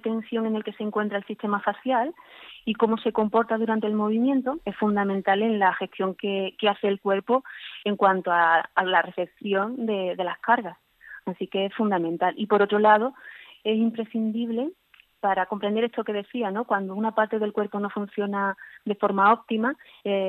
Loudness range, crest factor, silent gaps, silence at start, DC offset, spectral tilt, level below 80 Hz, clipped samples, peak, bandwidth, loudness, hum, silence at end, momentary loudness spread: 3 LU; 20 dB; none; 0.05 s; under 0.1%; -8 dB/octave; -72 dBFS; under 0.1%; -4 dBFS; 4.2 kHz; -25 LUFS; none; 0 s; 11 LU